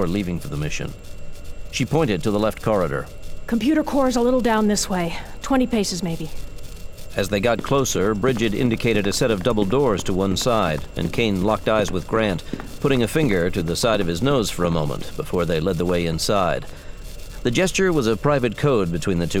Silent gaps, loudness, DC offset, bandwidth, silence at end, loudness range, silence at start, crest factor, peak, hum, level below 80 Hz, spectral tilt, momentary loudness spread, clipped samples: none; -21 LUFS; under 0.1%; 17 kHz; 0 s; 3 LU; 0 s; 16 dB; -4 dBFS; none; -36 dBFS; -5 dB/octave; 14 LU; under 0.1%